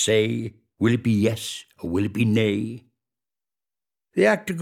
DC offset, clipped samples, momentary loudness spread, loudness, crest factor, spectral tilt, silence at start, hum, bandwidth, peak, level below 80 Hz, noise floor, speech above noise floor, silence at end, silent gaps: under 0.1%; under 0.1%; 13 LU; -23 LUFS; 20 dB; -5.5 dB/octave; 0 s; none; 15.5 kHz; -4 dBFS; -58 dBFS; under -90 dBFS; over 68 dB; 0 s; none